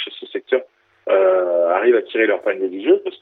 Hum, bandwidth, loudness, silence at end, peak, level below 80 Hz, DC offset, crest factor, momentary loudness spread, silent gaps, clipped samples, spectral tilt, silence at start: none; 4.1 kHz; -18 LUFS; 0.05 s; -4 dBFS; -78 dBFS; under 0.1%; 14 dB; 8 LU; none; under 0.1%; -6.5 dB/octave; 0 s